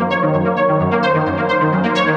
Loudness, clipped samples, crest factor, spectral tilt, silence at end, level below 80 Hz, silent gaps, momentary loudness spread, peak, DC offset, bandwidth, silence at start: -16 LUFS; under 0.1%; 12 dB; -7.5 dB/octave; 0 s; -52 dBFS; none; 1 LU; -2 dBFS; under 0.1%; 8.2 kHz; 0 s